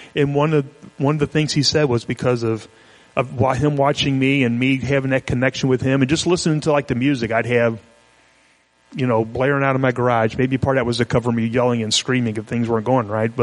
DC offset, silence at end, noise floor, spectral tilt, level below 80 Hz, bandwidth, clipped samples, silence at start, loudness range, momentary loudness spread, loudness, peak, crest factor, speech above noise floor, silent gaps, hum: under 0.1%; 0 s; -57 dBFS; -5.5 dB/octave; -46 dBFS; 11.5 kHz; under 0.1%; 0 s; 2 LU; 5 LU; -19 LUFS; -2 dBFS; 18 dB; 39 dB; none; none